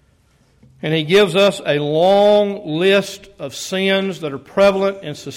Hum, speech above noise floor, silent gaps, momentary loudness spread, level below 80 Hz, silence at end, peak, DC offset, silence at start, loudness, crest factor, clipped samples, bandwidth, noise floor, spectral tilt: none; 40 dB; none; 15 LU; -56 dBFS; 0 s; -4 dBFS; under 0.1%; 0.85 s; -16 LUFS; 12 dB; under 0.1%; 16 kHz; -56 dBFS; -5 dB/octave